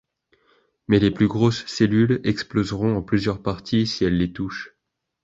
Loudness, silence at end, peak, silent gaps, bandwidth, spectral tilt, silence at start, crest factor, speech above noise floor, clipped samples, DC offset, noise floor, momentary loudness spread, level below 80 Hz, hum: -22 LUFS; 0.55 s; -4 dBFS; none; 7.8 kHz; -6.5 dB/octave; 0.9 s; 18 dB; 43 dB; under 0.1%; under 0.1%; -63 dBFS; 9 LU; -44 dBFS; none